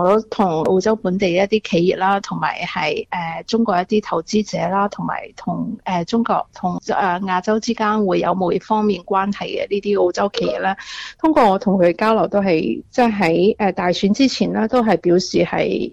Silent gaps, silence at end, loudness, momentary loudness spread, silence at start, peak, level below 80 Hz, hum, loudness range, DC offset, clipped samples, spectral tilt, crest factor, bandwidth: none; 0 s; -18 LUFS; 7 LU; 0 s; -4 dBFS; -50 dBFS; none; 4 LU; under 0.1%; under 0.1%; -6 dB/octave; 14 dB; 8.8 kHz